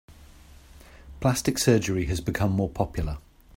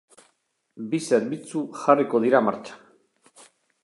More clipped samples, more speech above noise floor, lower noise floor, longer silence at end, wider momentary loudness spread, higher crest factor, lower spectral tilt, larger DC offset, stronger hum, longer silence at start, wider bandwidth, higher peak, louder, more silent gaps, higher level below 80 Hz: neither; second, 25 dB vs 48 dB; second, -50 dBFS vs -70 dBFS; second, 0.35 s vs 1.05 s; second, 10 LU vs 17 LU; about the same, 20 dB vs 22 dB; about the same, -5.5 dB/octave vs -5.5 dB/octave; neither; neither; second, 0.1 s vs 0.75 s; first, 16 kHz vs 11.5 kHz; about the same, -6 dBFS vs -4 dBFS; second, -26 LUFS vs -23 LUFS; neither; first, -40 dBFS vs -76 dBFS